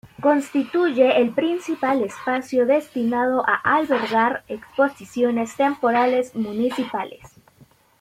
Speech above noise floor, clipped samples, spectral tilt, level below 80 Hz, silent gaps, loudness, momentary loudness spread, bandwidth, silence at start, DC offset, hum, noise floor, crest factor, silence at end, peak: 34 dB; under 0.1%; -5 dB/octave; -64 dBFS; none; -21 LUFS; 7 LU; 15 kHz; 0.05 s; under 0.1%; none; -54 dBFS; 16 dB; 0.75 s; -4 dBFS